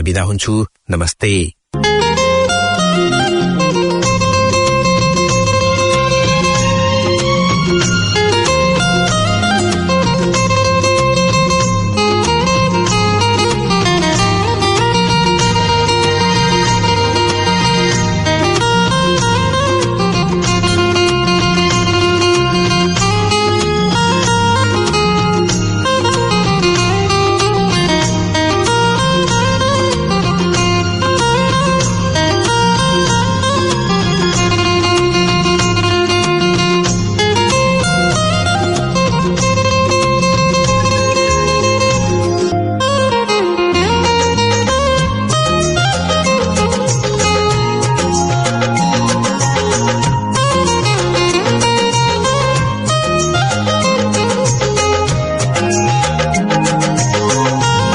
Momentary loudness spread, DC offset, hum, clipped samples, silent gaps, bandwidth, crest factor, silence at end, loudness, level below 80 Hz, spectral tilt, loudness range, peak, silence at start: 2 LU; under 0.1%; none; under 0.1%; none; 11 kHz; 12 dB; 0 s; -13 LUFS; -32 dBFS; -4.5 dB/octave; 1 LU; 0 dBFS; 0 s